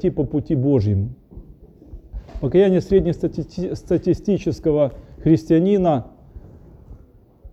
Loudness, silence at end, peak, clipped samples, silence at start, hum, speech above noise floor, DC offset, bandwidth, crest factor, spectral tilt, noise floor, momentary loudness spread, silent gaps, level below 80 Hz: -20 LUFS; 0.05 s; -4 dBFS; under 0.1%; 0 s; none; 31 dB; under 0.1%; 8.2 kHz; 16 dB; -9 dB/octave; -49 dBFS; 12 LU; none; -38 dBFS